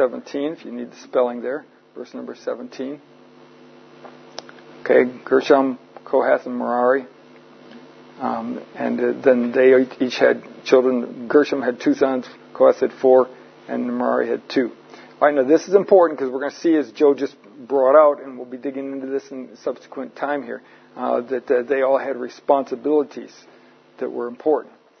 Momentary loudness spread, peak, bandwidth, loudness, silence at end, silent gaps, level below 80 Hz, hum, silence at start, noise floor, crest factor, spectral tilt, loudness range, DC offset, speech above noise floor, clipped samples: 16 LU; 0 dBFS; 6.6 kHz; -20 LUFS; 0.35 s; none; -74 dBFS; none; 0 s; -47 dBFS; 20 dB; -5.5 dB/octave; 9 LU; under 0.1%; 28 dB; under 0.1%